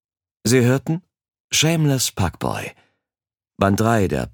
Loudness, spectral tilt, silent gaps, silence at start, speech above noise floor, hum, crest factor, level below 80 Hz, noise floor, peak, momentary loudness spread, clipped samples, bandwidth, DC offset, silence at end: -19 LUFS; -4.5 dB/octave; 1.40-1.48 s; 0.45 s; over 71 dB; none; 20 dB; -44 dBFS; under -90 dBFS; -2 dBFS; 10 LU; under 0.1%; 19 kHz; under 0.1%; 0.05 s